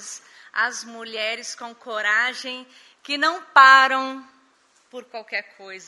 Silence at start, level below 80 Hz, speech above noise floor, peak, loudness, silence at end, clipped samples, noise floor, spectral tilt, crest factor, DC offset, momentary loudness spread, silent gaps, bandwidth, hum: 0 s; -86 dBFS; 39 dB; 0 dBFS; -19 LUFS; 0.1 s; under 0.1%; -60 dBFS; 0.5 dB/octave; 22 dB; under 0.1%; 25 LU; none; 11.5 kHz; none